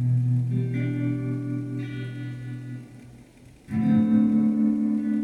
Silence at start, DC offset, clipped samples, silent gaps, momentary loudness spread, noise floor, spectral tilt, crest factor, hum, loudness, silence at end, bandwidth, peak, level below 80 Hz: 0 s; under 0.1%; under 0.1%; none; 15 LU; -50 dBFS; -10 dB/octave; 14 dB; none; -25 LUFS; 0 s; 4.5 kHz; -10 dBFS; -58 dBFS